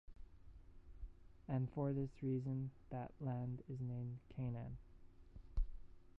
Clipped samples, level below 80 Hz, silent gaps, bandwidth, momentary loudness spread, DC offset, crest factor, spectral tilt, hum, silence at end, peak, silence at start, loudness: under 0.1%; -54 dBFS; none; 3.2 kHz; 23 LU; under 0.1%; 18 dB; -10.5 dB/octave; none; 0.1 s; -28 dBFS; 0.1 s; -46 LUFS